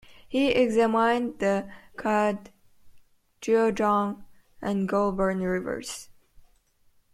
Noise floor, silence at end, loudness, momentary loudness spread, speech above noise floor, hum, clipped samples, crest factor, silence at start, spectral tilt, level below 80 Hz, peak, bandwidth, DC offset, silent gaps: -63 dBFS; 1.1 s; -26 LUFS; 15 LU; 38 dB; none; under 0.1%; 16 dB; 0.1 s; -5.5 dB/octave; -56 dBFS; -10 dBFS; 14.5 kHz; under 0.1%; none